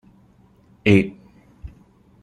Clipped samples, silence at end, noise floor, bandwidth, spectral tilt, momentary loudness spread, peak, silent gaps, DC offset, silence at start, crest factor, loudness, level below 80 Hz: under 0.1%; 0.55 s; -54 dBFS; 10 kHz; -7.5 dB/octave; 27 LU; -2 dBFS; none; under 0.1%; 0.85 s; 22 dB; -19 LUFS; -48 dBFS